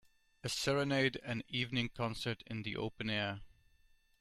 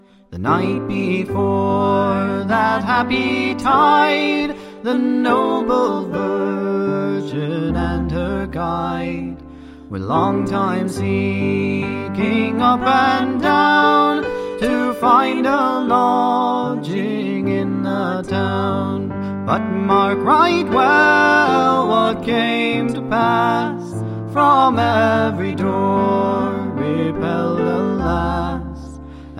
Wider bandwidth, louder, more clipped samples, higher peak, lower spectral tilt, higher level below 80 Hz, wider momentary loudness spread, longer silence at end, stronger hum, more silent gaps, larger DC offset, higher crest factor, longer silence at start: first, 15.5 kHz vs 14 kHz; second, -37 LUFS vs -17 LUFS; neither; second, -18 dBFS vs -2 dBFS; second, -4.5 dB/octave vs -6.5 dB/octave; second, -62 dBFS vs -40 dBFS; about the same, 9 LU vs 9 LU; first, 0.75 s vs 0 s; neither; neither; neither; about the same, 20 dB vs 16 dB; first, 0.45 s vs 0.3 s